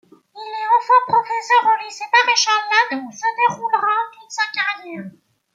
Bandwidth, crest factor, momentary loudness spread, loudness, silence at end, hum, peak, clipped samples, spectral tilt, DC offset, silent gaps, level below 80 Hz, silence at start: 7.8 kHz; 16 dB; 14 LU; -17 LUFS; 0.45 s; none; -2 dBFS; under 0.1%; -1 dB/octave; under 0.1%; none; -76 dBFS; 0.35 s